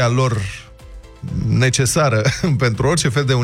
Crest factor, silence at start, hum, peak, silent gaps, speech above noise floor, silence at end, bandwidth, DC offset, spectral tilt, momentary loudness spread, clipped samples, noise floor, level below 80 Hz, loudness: 14 dB; 0 s; none; -4 dBFS; none; 21 dB; 0 s; 15 kHz; under 0.1%; -5 dB/octave; 13 LU; under 0.1%; -38 dBFS; -38 dBFS; -17 LUFS